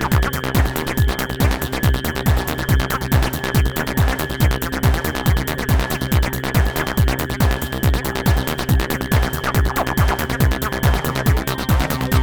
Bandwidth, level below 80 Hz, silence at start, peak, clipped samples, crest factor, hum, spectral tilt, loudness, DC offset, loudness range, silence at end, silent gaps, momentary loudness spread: over 20 kHz; -22 dBFS; 0 s; 0 dBFS; under 0.1%; 18 dB; none; -5.5 dB/octave; -19 LUFS; 0.9%; 0 LU; 0 s; none; 1 LU